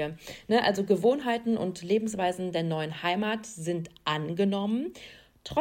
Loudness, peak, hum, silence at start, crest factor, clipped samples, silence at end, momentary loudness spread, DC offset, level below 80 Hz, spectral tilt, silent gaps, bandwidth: -29 LUFS; -12 dBFS; none; 0 s; 18 dB; under 0.1%; 0 s; 10 LU; under 0.1%; -62 dBFS; -5.5 dB/octave; none; 16.5 kHz